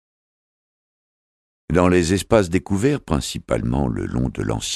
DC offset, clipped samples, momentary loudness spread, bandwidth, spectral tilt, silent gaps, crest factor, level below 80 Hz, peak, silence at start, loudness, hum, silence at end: under 0.1%; under 0.1%; 7 LU; 13.5 kHz; -5.5 dB/octave; none; 20 dB; -36 dBFS; -2 dBFS; 1.7 s; -20 LUFS; none; 0 s